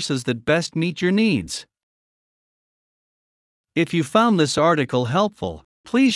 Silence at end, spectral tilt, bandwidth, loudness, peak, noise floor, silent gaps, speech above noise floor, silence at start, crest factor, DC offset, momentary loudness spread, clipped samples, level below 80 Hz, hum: 0 s; -5.5 dB/octave; 12 kHz; -20 LUFS; -4 dBFS; under -90 dBFS; 1.83-3.64 s, 5.65-5.84 s; over 70 dB; 0 s; 18 dB; under 0.1%; 13 LU; under 0.1%; -58 dBFS; none